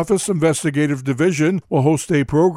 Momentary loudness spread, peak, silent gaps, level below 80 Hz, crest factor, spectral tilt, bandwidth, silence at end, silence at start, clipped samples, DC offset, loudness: 2 LU; -4 dBFS; none; -48 dBFS; 14 dB; -6 dB/octave; 15.5 kHz; 0 s; 0 s; under 0.1%; under 0.1%; -18 LUFS